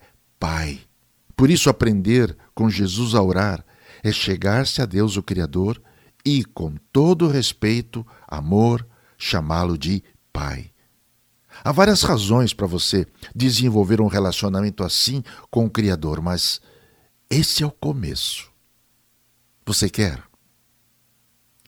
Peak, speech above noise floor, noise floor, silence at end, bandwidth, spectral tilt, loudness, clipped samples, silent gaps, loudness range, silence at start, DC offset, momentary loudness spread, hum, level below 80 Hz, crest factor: 0 dBFS; 43 dB; -63 dBFS; 1.45 s; 18.5 kHz; -5 dB/octave; -20 LUFS; under 0.1%; none; 5 LU; 0.4 s; under 0.1%; 13 LU; none; -40 dBFS; 22 dB